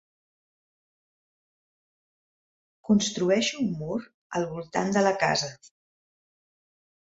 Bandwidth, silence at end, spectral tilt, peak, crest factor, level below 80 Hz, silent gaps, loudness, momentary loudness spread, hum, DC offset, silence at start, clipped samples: 8 kHz; 1.35 s; -4.5 dB/octave; -8 dBFS; 22 dB; -66 dBFS; 4.14-4.30 s; -26 LUFS; 11 LU; none; under 0.1%; 2.85 s; under 0.1%